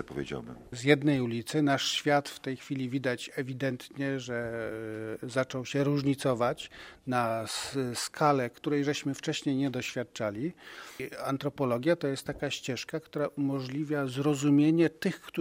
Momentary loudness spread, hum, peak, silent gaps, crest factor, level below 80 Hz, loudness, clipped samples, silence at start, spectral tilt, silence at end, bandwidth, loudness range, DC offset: 12 LU; none; -8 dBFS; none; 24 dB; -64 dBFS; -31 LUFS; under 0.1%; 0 s; -5.5 dB/octave; 0 s; 16 kHz; 4 LU; under 0.1%